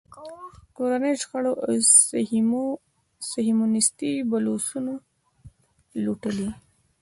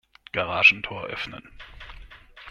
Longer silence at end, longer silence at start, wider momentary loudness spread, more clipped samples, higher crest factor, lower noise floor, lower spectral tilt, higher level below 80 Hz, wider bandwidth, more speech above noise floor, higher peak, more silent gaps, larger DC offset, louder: first, 0.45 s vs 0 s; second, 0.1 s vs 0.35 s; second, 22 LU vs 26 LU; neither; about the same, 22 dB vs 24 dB; first, -52 dBFS vs -46 dBFS; about the same, -3 dB/octave vs -3.5 dB/octave; second, -60 dBFS vs -50 dBFS; second, 11.5 kHz vs 13.5 kHz; first, 28 dB vs 22 dB; about the same, -4 dBFS vs -2 dBFS; neither; neither; about the same, -22 LUFS vs -21 LUFS